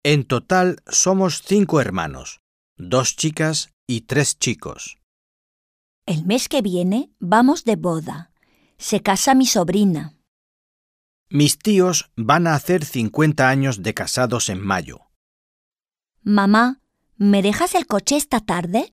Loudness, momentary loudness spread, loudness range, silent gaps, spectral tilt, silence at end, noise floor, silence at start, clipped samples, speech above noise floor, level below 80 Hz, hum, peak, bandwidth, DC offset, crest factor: -19 LUFS; 12 LU; 4 LU; 2.39-2.76 s, 3.73-3.87 s, 5.03-6.02 s, 10.28-11.26 s, 15.16-15.72 s; -4.5 dB/octave; 0.05 s; -74 dBFS; 0.05 s; under 0.1%; 55 dB; -52 dBFS; none; -2 dBFS; 15.5 kHz; under 0.1%; 18 dB